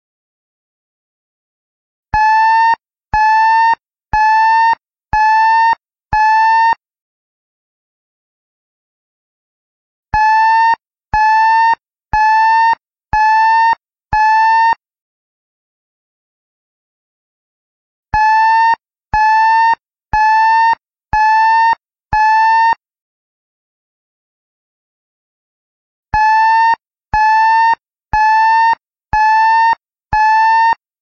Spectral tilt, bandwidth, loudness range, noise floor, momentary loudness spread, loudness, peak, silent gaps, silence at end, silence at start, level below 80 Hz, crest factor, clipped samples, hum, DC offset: -3 dB/octave; 6.8 kHz; 6 LU; under -90 dBFS; 10 LU; -12 LUFS; -2 dBFS; 7.02-10.03 s, 15.02-18.03 s, 23.02-26.03 s; 0.3 s; 2.15 s; -36 dBFS; 12 dB; under 0.1%; none; under 0.1%